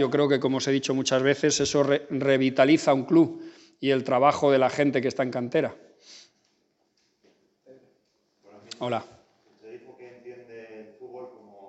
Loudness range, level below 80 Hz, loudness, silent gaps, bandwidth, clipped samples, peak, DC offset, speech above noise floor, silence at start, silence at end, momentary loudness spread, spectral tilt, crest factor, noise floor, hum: 17 LU; -68 dBFS; -24 LUFS; none; 8.4 kHz; under 0.1%; -4 dBFS; under 0.1%; 48 dB; 0 s; 0 s; 24 LU; -5 dB/octave; 22 dB; -71 dBFS; none